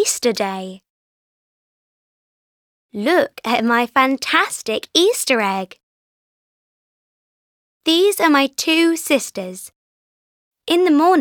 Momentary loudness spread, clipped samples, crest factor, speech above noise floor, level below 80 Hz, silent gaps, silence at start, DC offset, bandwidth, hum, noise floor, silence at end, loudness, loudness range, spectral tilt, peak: 15 LU; under 0.1%; 18 dB; over 73 dB; -68 dBFS; 0.90-2.89 s, 5.83-7.80 s, 9.76-10.52 s; 0 s; under 0.1%; 20 kHz; none; under -90 dBFS; 0 s; -17 LUFS; 5 LU; -2.5 dB/octave; 0 dBFS